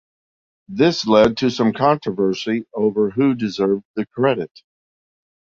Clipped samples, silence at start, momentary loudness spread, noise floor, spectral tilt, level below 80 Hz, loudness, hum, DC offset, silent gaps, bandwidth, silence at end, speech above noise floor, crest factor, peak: under 0.1%; 0.7 s; 9 LU; under -90 dBFS; -6 dB/octave; -54 dBFS; -19 LUFS; none; under 0.1%; 3.85-3.94 s; 7.6 kHz; 1.15 s; over 72 dB; 18 dB; -2 dBFS